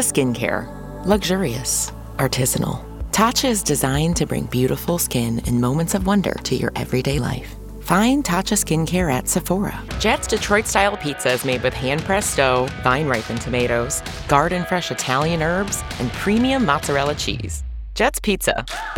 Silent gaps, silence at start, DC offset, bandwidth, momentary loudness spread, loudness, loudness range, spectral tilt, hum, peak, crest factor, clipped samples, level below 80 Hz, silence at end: none; 0 s; under 0.1%; 19.5 kHz; 7 LU; -20 LUFS; 1 LU; -4 dB/octave; none; -2 dBFS; 18 dB; under 0.1%; -34 dBFS; 0 s